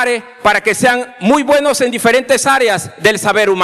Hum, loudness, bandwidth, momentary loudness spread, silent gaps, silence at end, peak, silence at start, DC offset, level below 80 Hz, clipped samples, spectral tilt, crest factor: none; -12 LUFS; 15 kHz; 4 LU; none; 0 s; 0 dBFS; 0 s; under 0.1%; -52 dBFS; under 0.1%; -3 dB/octave; 12 dB